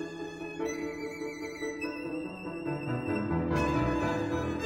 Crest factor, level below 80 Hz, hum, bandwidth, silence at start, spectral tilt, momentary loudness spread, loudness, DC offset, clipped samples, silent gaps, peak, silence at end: 16 dB; -48 dBFS; none; 16.5 kHz; 0 s; -6.5 dB/octave; 9 LU; -33 LUFS; under 0.1%; under 0.1%; none; -16 dBFS; 0 s